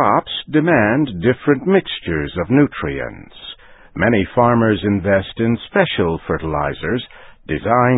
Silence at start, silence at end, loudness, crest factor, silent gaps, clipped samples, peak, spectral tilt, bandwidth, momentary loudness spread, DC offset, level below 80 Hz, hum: 0 s; 0 s; -17 LUFS; 16 dB; none; under 0.1%; 0 dBFS; -12 dB/octave; 4 kHz; 12 LU; under 0.1%; -38 dBFS; none